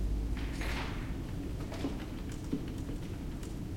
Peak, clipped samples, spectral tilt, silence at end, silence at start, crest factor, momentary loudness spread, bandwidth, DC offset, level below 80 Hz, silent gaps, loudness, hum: -20 dBFS; under 0.1%; -6 dB/octave; 0 s; 0 s; 16 dB; 5 LU; 16.5 kHz; under 0.1%; -40 dBFS; none; -39 LUFS; none